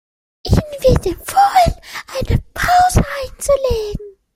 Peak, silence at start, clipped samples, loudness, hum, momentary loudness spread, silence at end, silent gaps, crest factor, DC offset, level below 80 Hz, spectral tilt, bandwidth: 0 dBFS; 0.45 s; under 0.1%; -16 LUFS; none; 14 LU; 0.25 s; none; 16 dB; under 0.1%; -26 dBFS; -5 dB/octave; 16.5 kHz